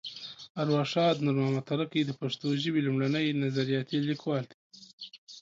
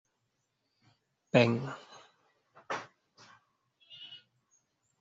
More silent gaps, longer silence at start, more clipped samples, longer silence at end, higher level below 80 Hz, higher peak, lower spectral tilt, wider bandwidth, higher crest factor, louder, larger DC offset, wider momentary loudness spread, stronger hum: first, 0.50-0.55 s, 4.54-4.70 s, 4.93-4.98 s, 5.18-5.27 s vs none; second, 0.05 s vs 1.35 s; neither; second, 0 s vs 0.85 s; about the same, -74 dBFS vs -76 dBFS; second, -16 dBFS vs -8 dBFS; first, -6.5 dB/octave vs -5 dB/octave; about the same, 7.6 kHz vs 7.6 kHz; second, 14 dB vs 28 dB; about the same, -29 LUFS vs -31 LUFS; neither; second, 16 LU vs 28 LU; neither